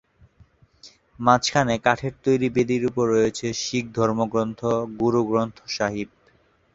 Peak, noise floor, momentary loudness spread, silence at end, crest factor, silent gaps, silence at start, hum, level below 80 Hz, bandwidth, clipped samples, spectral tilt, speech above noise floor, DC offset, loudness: -2 dBFS; -60 dBFS; 7 LU; 0.7 s; 22 dB; none; 0.85 s; none; -54 dBFS; 8 kHz; under 0.1%; -5 dB/octave; 38 dB; under 0.1%; -23 LUFS